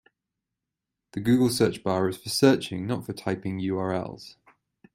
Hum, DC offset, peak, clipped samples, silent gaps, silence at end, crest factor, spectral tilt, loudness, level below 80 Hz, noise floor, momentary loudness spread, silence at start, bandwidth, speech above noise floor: none; under 0.1%; -4 dBFS; under 0.1%; none; 0.65 s; 22 dB; -5.5 dB/octave; -26 LUFS; -62 dBFS; -86 dBFS; 11 LU; 1.15 s; 16 kHz; 61 dB